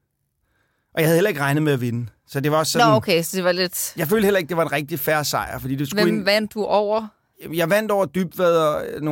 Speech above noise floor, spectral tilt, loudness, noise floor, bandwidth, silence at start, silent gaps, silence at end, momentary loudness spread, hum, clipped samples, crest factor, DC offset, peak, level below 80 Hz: 51 dB; -4.5 dB/octave; -20 LUFS; -71 dBFS; 17 kHz; 0.95 s; none; 0 s; 8 LU; none; under 0.1%; 16 dB; under 0.1%; -4 dBFS; -54 dBFS